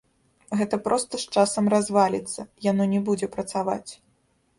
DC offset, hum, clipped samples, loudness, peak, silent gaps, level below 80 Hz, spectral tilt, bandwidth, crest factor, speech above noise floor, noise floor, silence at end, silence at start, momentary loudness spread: under 0.1%; none; under 0.1%; -24 LUFS; -6 dBFS; none; -62 dBFS; -5 dB/octave; 11.5 kHz; 18 dB; 43 dB; -66 dBFS; 0.65 s; 0.5 s; 9 LU